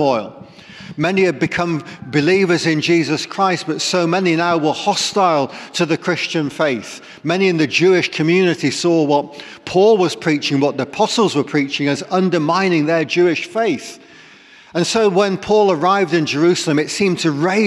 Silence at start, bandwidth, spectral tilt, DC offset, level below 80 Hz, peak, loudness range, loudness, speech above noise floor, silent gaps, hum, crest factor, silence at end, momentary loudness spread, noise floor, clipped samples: 0 s; 12.5 kHz; -5 dB/octave; under 0.1%; -60 dBFS; -4 dBFS; 2 LU; -16 LUFS; 28 dB; none; none; 12 dB; 0 s; 7 LU; -44 dBFS; under 0.1%